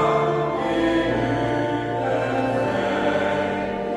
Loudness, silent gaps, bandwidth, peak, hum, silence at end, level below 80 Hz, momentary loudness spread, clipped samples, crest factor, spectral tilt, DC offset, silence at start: -22 LUFS; none; 11.5 kHz; -8 dBFS; none; 0 s; -46 dBFS; 3 LU; under 0.1%; 14 dB; -6.5 dB/octave; under 0.1%; 0 s